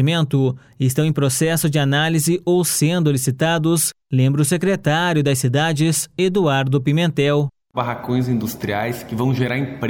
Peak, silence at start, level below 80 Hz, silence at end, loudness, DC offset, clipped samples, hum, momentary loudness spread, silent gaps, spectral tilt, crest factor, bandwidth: -6 dBFS; 0 s; -54 dBFS; 0 s; -18 LUFS; under 0.1%; under 0.1%; none; 6 LU; none; -5 dB/octave; 12 dB; 17 kHz